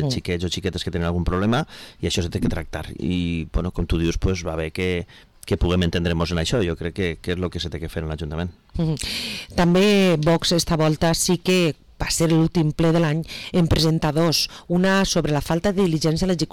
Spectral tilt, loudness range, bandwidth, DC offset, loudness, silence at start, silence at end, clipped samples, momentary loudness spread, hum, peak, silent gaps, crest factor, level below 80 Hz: -5 dB/octave; 6 LU; 17 kHz; under 0.1%; -22 LUFS; 0 s; 0.05 s; under 0.1%; 10 LU; none; -10 dBFS; none; 10 dB; -34 dBFS